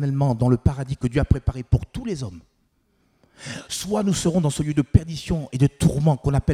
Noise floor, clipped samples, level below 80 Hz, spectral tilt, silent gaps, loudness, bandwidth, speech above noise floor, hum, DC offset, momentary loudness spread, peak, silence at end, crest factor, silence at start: -66 dBFS; under 0.1%; -34 dBFS; -6.5 dB/octave; none; -22 LUFS; 15 kHz; 45 dB; none; under 0.1%; 10 LU; 0 dBFS; 0 s; 20 dB; 0 s